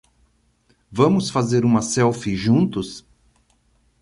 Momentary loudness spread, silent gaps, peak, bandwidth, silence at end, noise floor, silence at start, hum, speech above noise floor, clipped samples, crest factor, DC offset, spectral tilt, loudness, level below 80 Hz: 13 LU; none; -4 dBFS; 11.5 kHz; 1.05 s; -62 dBFS; 0.9 s; none; 43 dB; under 0.1%; 18 dB; under 0.1%; -6 dB/octave; -19 LUFS; -50 dBFS